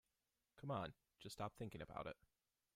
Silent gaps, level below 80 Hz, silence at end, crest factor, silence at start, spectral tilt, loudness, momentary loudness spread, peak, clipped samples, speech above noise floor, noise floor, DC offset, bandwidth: none; -74 dBFS; 0.65 s; 20 dB; 0.55 s; -6 dB/octave; -52 LUFS; 10 LU; -34 dBFS; under 0.1%; over 39 dB; under -90 dBFS; under 0.1%; 15.5 kHz